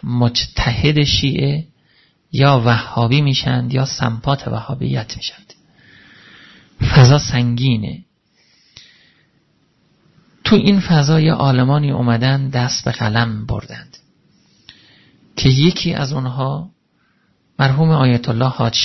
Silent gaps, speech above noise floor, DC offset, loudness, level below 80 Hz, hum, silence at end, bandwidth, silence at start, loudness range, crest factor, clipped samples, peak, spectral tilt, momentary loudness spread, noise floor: none; 46 dB; under 0.1%; -16 LUFS; -36 dBFS; none; 0 s; 6.2 kHz; 0 s; 6 LU; 16 dB; under 0.1%; 0 dBFS; -6 dB/octave; 13 LU; -61 dBFS